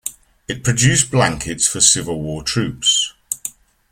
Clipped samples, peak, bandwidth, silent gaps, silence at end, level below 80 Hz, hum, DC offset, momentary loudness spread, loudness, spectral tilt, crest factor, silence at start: under 0.1%; 0 dBFS; 16.5 kHz; none; 0.4 s; -44 dBFS; none; under 0.1%; 13 LU; -16 LUFS; -2.5 dB/octave; 18 dB; 0.05 s